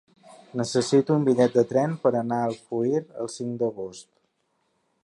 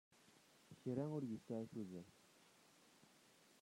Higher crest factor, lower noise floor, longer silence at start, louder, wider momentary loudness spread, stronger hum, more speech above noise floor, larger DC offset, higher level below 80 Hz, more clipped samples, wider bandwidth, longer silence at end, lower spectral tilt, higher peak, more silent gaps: about the same, 18 dB vs 20 dB; about the same, -72 dBFS vs -71 dBFS; about the same, 0.3 s vs 0.2 s; first, -24 LUFS vs -49 LUFS; second, 12 LU vs 24 LU; neither; first, 49 dB vs 24 dB; neither; first, -70 dBFS vs -88 dBFS; neither; second, 11.5 kHz vs 16 kHz; first, 1 s vs 0.1 s; second, -6 dB/octave vs -7.5 dB/octave; first, -6 dBFS vs -32 dBFS; neither